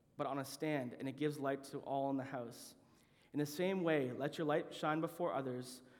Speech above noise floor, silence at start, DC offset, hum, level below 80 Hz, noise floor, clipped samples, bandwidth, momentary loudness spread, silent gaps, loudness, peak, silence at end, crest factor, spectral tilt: 29 dB; 0.2 s; under 0.1%; none; -84 dBFS; -69 dBFS; under 0.1%; over 20 kHz; 9 LU; none; -40 LUFS; -22 dBFS; 0 s; 18 dB; -6 dB/octave